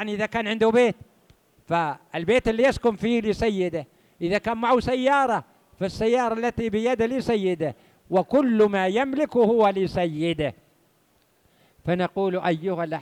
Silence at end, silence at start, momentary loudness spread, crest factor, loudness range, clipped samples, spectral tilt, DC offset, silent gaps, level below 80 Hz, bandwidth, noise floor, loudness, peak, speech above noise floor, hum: 0 s; 0 s; 9 LU; 14 dB; 3 LU; under 0.1%; -6.5 dB/octave; under 0.1%; none; -50 dBFS; 12.5 kHz; -64 dBFS; -23 LUFS; -10 dBFS; 41 dB; none